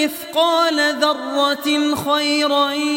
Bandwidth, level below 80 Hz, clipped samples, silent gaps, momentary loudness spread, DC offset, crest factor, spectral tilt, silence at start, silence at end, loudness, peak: 17 kHz; -64 dBFS; under 0.1%; none; 3 LU; under 0.1%; 16 dB; -2.5 dB/octave; 0 s; 0 s; -17 LUFS; -2 dBFS